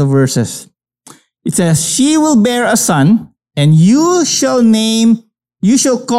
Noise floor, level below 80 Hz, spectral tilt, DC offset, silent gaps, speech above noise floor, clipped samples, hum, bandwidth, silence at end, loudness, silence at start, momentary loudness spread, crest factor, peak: -42 dBFS; -52 dBFS; -5 dB/octave; under 0.1%; none; 32 dB; under 0.1%; none; 15 kHz; 0 s; -11 LUFS; 0 s; 8 LU; 10 dB; -2 dBFS